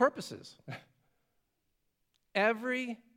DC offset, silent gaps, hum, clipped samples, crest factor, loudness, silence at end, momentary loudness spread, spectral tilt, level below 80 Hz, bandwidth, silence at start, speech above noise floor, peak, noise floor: under 0.1%; none; none; under 0.1%; 24 dB; -32 LUFS; 0.2 s; 18 LU; -4.5 dB/octave; -86 dBFS; 16 kHz; 0 s; 47 dB; -12 dBFS; -80 dBFS